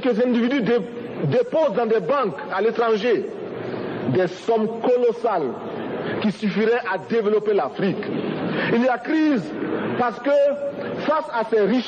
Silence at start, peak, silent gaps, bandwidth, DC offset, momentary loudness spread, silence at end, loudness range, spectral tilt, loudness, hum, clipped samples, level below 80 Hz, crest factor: 0 s; -10 dBFS; none; 8.8 kHz; under 0.1%; 8 LU; 0 s; 2 LU; -7.5 dB/octave; -22 LUFS; none; under 0.1%; -66 dBFS; 12 dB